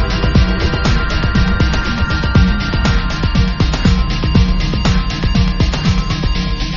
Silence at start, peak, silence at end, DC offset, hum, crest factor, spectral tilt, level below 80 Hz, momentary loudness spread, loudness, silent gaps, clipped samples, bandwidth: 0 s; 0 dBFS; 0 s; under 0.1%; none; 12 dB; -5 dB/octave; -16 dBFS; 3 LU; -15 LUFS; none; under 0.1%; 7.2 kHz